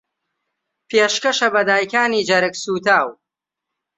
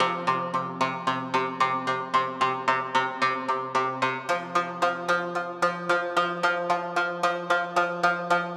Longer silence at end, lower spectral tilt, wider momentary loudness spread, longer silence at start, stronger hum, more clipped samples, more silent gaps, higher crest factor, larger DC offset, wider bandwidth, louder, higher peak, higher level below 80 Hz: first, 0.85 s vs 0 s; second, -2.5 dB/octave vs -4 dB/octave; about the same, 5 LU vs 4 LU; first, 0.9 s vs 0 s; neither; neither; neither; about the same, 18 dB vs 18 dB; neither; second, 8.4 kHz vs 13.5 kHz; first, -17 LUFS vs -26 LUFS; first, -2 dBFS vs -8 dBFS; first, -66 dBFS vs -82 dBFS